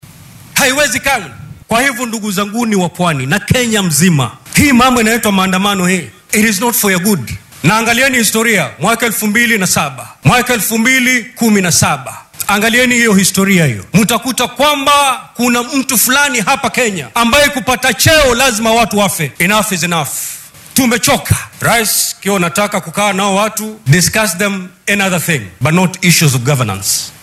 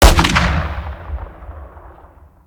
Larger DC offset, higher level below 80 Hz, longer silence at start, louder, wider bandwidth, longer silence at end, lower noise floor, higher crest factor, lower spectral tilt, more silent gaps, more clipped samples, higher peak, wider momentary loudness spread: neither; second, -38 dBFS vs -20 dBFS; first, 0.5 s vs 0 s; first, -11 LUFS vs -16 LUFS; about the same, over 20 kHz vs over 20 kHz; second, 0.1 s vs 0.55 s; second, -36 dBFS vs -44 dBFS; about the same, 12 dB vs 16 dB; about the same, -3.5 dB/octave vs -4 dB/octave; neither; first, 0.3% vs under 0.1%; about the same, 0 dBFS vs 0 dBFS; second, 7 LU vs 23 LU